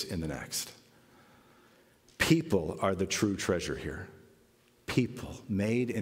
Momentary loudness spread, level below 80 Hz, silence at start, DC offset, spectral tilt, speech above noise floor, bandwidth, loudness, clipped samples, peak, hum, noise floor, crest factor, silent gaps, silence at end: 16 LU; -54 dBFS; 0 s; under 0.1%; -5 dB/octave; 33 dB; 16 kHz; -31 LUFS; under 0.1%; -10 dBFS; none; -65 dBFS; 22 dB; none; 0 s